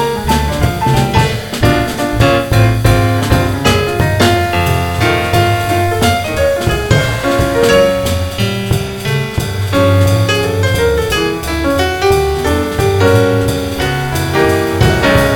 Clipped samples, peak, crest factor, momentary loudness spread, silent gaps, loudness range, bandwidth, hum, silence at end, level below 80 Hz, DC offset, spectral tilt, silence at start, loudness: under 0.1%; 0 dBFS; 12 dB; 6 LU; none; 2 LU; 19.5 kHz; none; 0 s; -26 dBFS; under 0.1%; -5.5 dB/octave; 0 s; -13 LUFS